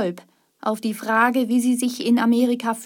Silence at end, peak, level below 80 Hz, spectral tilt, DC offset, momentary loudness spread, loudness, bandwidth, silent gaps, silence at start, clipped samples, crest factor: 0 s; -4 dBFS; -76 dBFS; -4.5 dB/octave; under 0.1%; 9 LU; -21 LUFS; 17 kHz; none; 0 s; under 0.1%; 16 dB